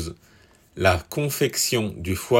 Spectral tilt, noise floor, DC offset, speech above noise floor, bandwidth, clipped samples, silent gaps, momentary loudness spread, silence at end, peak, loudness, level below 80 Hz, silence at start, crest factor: -4 dB/octave; -55 dBFS; under 0.1%; 33 dB; 16.5 kHz; under 0.1%; none; 7 LU; 0 s; -4 dBFS; -23 LUFS; -50 dBFS; 0 s; 20 dB